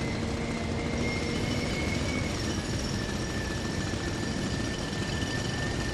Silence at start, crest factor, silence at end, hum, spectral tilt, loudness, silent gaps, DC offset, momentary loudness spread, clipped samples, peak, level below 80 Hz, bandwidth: 0 s; 14 dB; 0 s; none; -5 dB/octave; -31 LUFS; none; under 0.1%; 2 LU; under 0.1%; -16 dBFS; -40 dBFS; 14 kHz